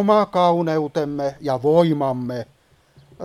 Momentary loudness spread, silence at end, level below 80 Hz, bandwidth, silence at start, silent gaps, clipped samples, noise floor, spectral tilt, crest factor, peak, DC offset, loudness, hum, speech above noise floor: 11 LU; 0 s; -58 dBFS; 13 kHz; 0 s; none; under 0.1%; -54 dBFS; -7.5 dB/octave; 18 dB; -2 dBFS; under 0.1%; -20 LUFS; none; 35 dB